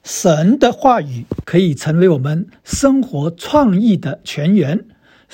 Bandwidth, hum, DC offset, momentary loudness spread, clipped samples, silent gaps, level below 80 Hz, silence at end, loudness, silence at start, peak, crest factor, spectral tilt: 16.5 kHz; none; under 0.1%; 11 LU; under 0.1%; none; -42 dBFS; 0.5 s; -15 LUFS; 0.05 s; 0 dBFS; 14 dB; -6 dB/octave